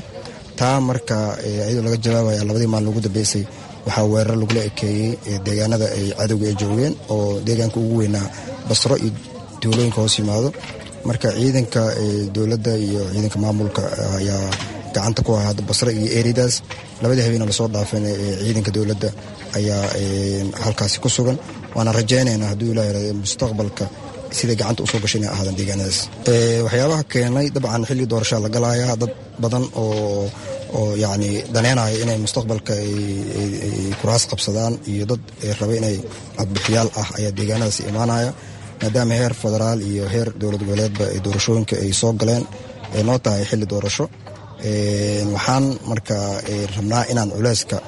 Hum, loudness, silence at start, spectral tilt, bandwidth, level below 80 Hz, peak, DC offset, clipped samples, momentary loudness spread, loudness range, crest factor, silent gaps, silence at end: none; -20 LUFS; 0 s; -5 dB/octave; 11.5 kHz; -46 dBFS; -2 dBFS; under 0.1%; under 0.1%; 7 LU; 2 LU; 18 dB; none; 0 s